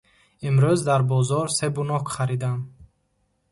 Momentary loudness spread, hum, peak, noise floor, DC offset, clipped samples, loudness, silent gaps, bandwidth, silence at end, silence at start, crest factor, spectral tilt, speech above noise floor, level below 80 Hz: 11 LU; none; -8 dBFS; -70 dBFS; under 0.1%; under 0.1%; -23 LUFS; none; 11.5 kHz; 0.7 s; 0.4 s; 16 dB; -6 dB/octave; 48 dB; -56 dBFS